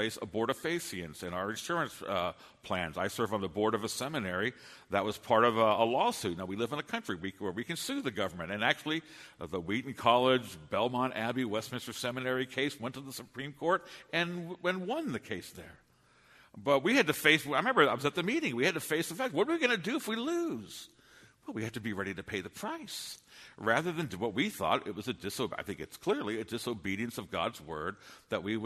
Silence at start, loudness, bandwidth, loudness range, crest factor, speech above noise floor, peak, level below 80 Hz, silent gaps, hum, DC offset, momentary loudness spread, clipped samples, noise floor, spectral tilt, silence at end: 0 s; -33 LUFS; 13.5 kHz; 7 LU; 24 dB; 32 dB; -10 dBFS; -68 dBFS; none; none; under 0.1%; 14 LU; under 0.1%; -65 dBFS; -4 dB/octave; 0 s